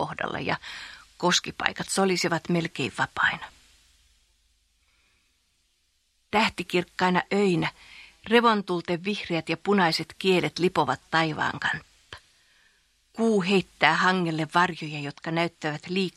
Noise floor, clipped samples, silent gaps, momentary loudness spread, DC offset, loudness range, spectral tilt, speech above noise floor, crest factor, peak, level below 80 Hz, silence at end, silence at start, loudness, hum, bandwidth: -70 dBFS; under 0.1%; none; 13 LU; under 0.1%; 7 LU; -4.5 dB/octave; 45 dB; 26 dB; 0 dBFS; -62 dBFS; 0.05 s; 0 s; -25 LUFS; none; 14 kHz